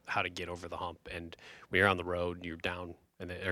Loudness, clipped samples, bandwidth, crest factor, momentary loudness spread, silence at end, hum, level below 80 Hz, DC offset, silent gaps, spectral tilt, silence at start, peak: -35 LUFS; under 0.1%; 15 kHz; 24 dB; 19 LU; 0 s; none; -60 dBFS; under 0.1%; none; -5 dB/octave; 0.05 s; -12 dBFS